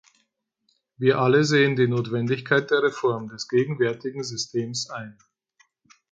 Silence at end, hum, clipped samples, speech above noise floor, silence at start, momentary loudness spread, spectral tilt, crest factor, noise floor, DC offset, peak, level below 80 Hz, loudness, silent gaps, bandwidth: 1 s; none; under 0.1%; 50 dB; 1 s; 12 LU; -5.5 dB/octave; 18 dB; -73 dBFS; under 0.1%; -6 dBFS; -66 dBFS; -23 LUFS; none; 9.2 kHz